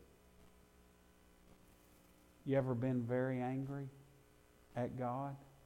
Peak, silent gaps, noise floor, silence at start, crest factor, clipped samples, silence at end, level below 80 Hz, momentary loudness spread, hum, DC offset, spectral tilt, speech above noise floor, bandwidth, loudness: -24 dBFS; none; -67 dBFS; 0 s; 18 dB; under 0.1%; 0.15 s; -70 dBFS; 12 LU; none; under 0.1%; -9 dB/octave; 28 dB; 16 kHz; -41 LUFS